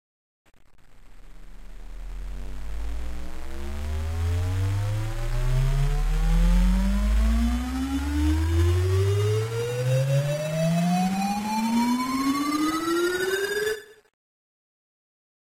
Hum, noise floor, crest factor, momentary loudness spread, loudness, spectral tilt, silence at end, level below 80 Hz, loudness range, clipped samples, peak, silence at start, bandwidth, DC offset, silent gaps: none; -47 dBFS; 12 dB; 15 LU; -25 LUFS; -6 dB/octave; 1.55 s; -28 dBFS; 12 LU; under 0.1%; -12 dBFS; 0.6 s; 16 kHz; under 0.1%; none